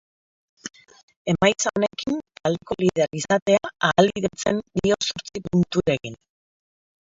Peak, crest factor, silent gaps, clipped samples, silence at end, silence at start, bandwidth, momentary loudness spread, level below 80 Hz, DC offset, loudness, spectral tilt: -2 dBFS; 22 dB; 1.03-1.08 s, 1.16-1.25 s, 3.42-3.46 s; under 0.1%; 0.85 s; 0.65 s; 7.8 kHz; 13 LU; -52 dBFS; under 0.1%; -23 LUFS; -4.5 dB/octave